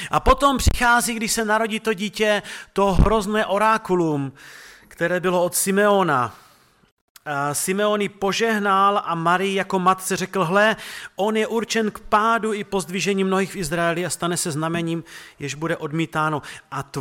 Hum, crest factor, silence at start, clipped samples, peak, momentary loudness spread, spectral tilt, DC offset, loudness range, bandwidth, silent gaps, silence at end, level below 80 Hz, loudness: none; 20 dB; 0 s; under 0.1%; -2 dBFS; 11 LU; -4 dB/octave; under 0.1%; 4 LU; 17.5 kHz; 6.92-7.15 s; 0 s; -34 dBFS; -21 LUFS